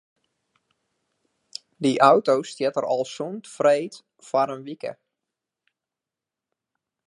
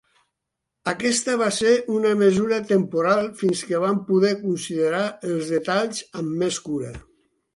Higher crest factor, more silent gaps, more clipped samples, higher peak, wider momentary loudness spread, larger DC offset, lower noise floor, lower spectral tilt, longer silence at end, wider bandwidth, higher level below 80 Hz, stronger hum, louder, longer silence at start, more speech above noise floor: first, 24 dB vs 16 dB; neither; neither; first, -2 dBFS vs -6 dBFS; first, 19 LU vs 10 LU; neither; first, -88 dBFS vs -82 dBFS; about the same, -5 dB/octave vs -4.5 dB/octave; first, 2.15 s vs 0.55 s; about the same, 11.5 kHz vs 11.5 kHz; second, -80 dBFS vs -58 dBFS; neither; about the same, -22 LUFS vs -22 LUFS; first, 1.8 s vs 0.85 s; first, 66 dB vs 60 dB